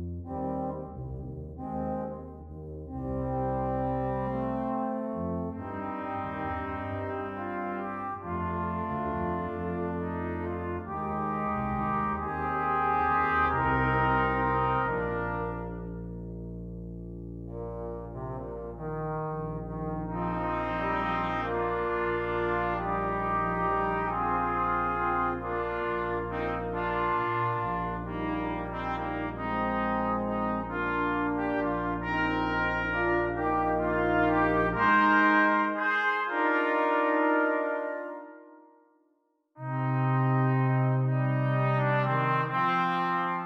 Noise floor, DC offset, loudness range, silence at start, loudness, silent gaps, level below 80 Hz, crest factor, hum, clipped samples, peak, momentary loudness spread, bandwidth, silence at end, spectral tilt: -72 dBFS; under 0.1%; 10 LU; 0 s; -29 LUFS; none; -46 dBFS; 18 dB; none; under 0.1%; -12 dBFS; 13 LU; 6 kHz; 0 s; -8.5 dB/octave